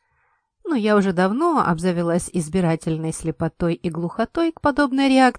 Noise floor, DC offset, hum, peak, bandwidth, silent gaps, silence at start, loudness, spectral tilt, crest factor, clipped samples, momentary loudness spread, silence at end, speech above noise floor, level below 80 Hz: -66 dBFS; under 0.1%; none; -4 dBFS; 10.5 kHz; none; 0.65 s; -21 LUFS; -6 dB/octave; 18 dB; under 0.1%; 8 LU; 0.05 s; 46 dB; -46 dBFS